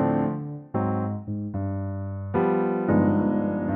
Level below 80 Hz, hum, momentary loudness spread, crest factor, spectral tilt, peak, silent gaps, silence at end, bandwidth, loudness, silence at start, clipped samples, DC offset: -56 dBFS; none; 10 LU; 16 dB; -10 dB/octave; -10 dBFS; none; 0 s; 3.5 kHz; -26 LUFS; 0 s; under 0.1%; under 0.1%